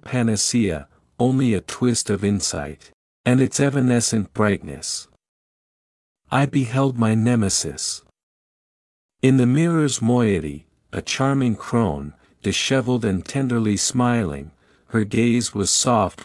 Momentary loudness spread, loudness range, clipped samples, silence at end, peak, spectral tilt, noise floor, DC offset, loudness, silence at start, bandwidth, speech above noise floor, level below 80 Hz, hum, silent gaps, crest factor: 10 LU; 2 LU; under 0.1%; 0.15 s; -4 dBFS; -5 dB/octave; under -90 dBFS; under 0.1%; -20 LUFS; 0.05 s; 12 kHz; over 70 dB; -50 dBFS; none; 2.94-3.24 s, 5.28-6.15 s, 8.23-9.09 s; 18 dB